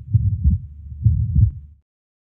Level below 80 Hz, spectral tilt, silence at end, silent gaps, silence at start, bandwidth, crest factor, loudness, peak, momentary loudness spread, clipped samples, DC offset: -24 dBFS; -15.5 dB/octave; 0.6 s; none; 0 s; 0.4 kHz; 16 dB; -20 LUFS; -4 dBFS; 13 LU; under 0.1%; under 0.1%